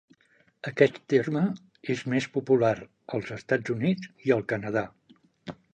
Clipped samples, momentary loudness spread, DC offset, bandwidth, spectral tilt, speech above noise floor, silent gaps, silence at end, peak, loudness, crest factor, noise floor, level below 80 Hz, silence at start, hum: under 0.1%; 15 LU; under 0.1%; 8.8 kHz; -7 dB/octave; 38 dB; none; 0.2 s; -6 dBFS; -27 LUFS; 22 dB; -65 dBFS; -66 dBFS; 0.65 s; none